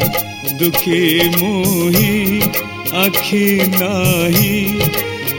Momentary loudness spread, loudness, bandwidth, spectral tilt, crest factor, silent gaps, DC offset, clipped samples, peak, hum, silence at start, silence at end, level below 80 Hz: 4 LU; -14 LUFS; over 20 kHz; -4.5 dB/octave; 14 dB; none; under 0.1%; under 0.1%; 0 dBFS; none; 0 s; 0 s; -40 dBFS